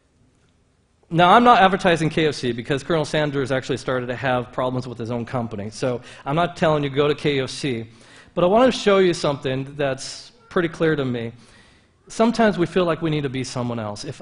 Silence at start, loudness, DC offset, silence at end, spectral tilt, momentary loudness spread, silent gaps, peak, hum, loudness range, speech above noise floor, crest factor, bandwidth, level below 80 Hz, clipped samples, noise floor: 1.1 s; -21 LUFS; under 0.1%; 0 s; -5.5 dB/octave; 12 LU; none; 0 dBFS; none; 6 LU; 41 dB; 20 dB; 11 kHz; -50 dBFS; under 0.1%; -61 dBFS